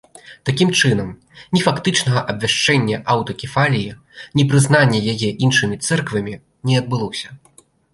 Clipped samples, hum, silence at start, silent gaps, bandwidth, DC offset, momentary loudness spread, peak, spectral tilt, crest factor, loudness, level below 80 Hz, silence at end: under 0.1%; none; 0.25 s; none; 11.5 kHz; under 0.1%; 12 LU; -2 dBFS; -4.5 dB/octave; 16 dB; -17 LUFS; -50 dBFS; 0.6 s